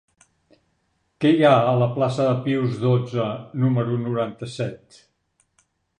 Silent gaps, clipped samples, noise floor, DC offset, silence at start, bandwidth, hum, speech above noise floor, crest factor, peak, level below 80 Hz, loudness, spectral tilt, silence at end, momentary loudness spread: none; under 0.1%; -70 dBFS; under 0.1%; 1.2 s; 9.8 kHz; none; 49 dB; 20 dB; -2 dBFS; -64 dBFS; -21 LUFS; -8 dB/octave; 1.25 s; 13 LU